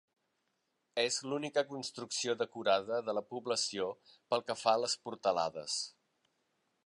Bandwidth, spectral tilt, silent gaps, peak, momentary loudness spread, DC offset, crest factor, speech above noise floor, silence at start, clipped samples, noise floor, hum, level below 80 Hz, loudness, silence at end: 11.5 kHz; -2 dB/octave; none; -14 dBFS; 8 LU; under 0.1%; 22 dB; 46 dB; 0.95 s; under 0.1%; -82 dBFS; none; -82 dBFS; -35 LUFS; 0.95 s